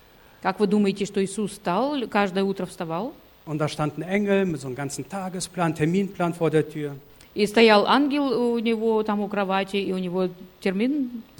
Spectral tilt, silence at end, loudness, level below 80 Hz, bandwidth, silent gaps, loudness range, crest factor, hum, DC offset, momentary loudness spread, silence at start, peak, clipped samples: -5.5 dB/octave; 0.15 s; -24 LUFS; -58 dBFS; 17.5 kHz; none; 5 LU; 20 dB; none; under 0.1%; 10 LU; 0.4 s; -4 dBFS; under 0.1%